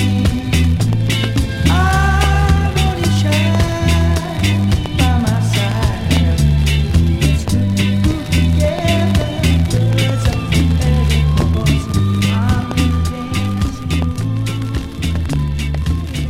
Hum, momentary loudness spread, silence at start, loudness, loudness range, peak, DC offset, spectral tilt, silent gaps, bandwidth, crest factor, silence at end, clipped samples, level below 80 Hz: none; 6 LU; 0 s; -15 LUFS; 3 LU; 0 dBFS; under 0.1%; -6 dB/octave; none; 16 kHz; 14 dB; 0 s; under 0.1%; -20 dBFS